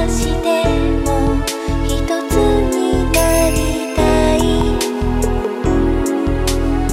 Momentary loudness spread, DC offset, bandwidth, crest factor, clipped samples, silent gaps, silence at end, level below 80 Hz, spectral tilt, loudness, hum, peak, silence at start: 5 LU; under 0.1%; 16 kHz; 14 dB; under 0.1%; none; 0 s; -20 dBFS; -5.5 dB/octave; -16 LUFS; none; 0 dBFS; 0 s